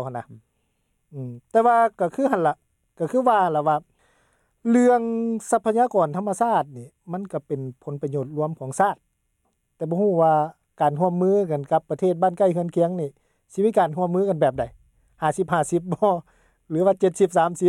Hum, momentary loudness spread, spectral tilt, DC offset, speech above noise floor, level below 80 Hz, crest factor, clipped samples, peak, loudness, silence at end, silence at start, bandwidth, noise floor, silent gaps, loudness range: none; 14 LU; -7 dB/octave; under 0.1%; 50 dB; -62 dBFS; 16 dB; under 0.1%; -6 dBFS; -22 LUFS; 0 s; 0 s; 13 kHz; -71 dBFS; none; 4 LU